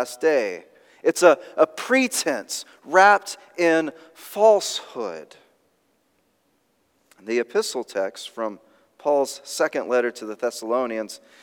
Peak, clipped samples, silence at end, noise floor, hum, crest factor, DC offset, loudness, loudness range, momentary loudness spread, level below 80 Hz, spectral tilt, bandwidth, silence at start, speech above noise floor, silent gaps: -2 dBFS; under 0.1%; 0.25 s; -67 dBFS; none; 20 dB; under 0.1%; -22 LUFS; 10 LU; 15 LU; -88 dBFS; -2.5 dB/octave; 18 kHz; 0 s; 45 dB; none